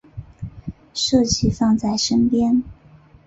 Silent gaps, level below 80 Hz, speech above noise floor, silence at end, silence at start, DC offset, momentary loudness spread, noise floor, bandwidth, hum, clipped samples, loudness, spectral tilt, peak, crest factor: none; -40 dBFS; 31 dB; 0.55 s; 0.15 s; under 0.1%; 19 LU; -48 dBFS; 8 kHz; none; under 0.1%; -18 LUFS; -5 dB/octave; -4 dBFS; 16 dB